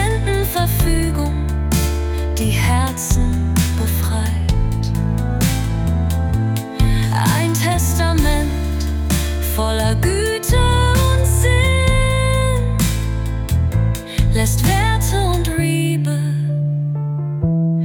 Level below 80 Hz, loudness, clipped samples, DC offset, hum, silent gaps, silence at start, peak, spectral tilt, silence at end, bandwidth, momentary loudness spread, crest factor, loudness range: -22 dBFS; -18 LUFS; under 0.1%; under 0.1%; none; none; 0 s; -4 dBFS; -5.5 dB/octave; 0 s; 18 kHz; 5 LU; 12 dB; 3 LU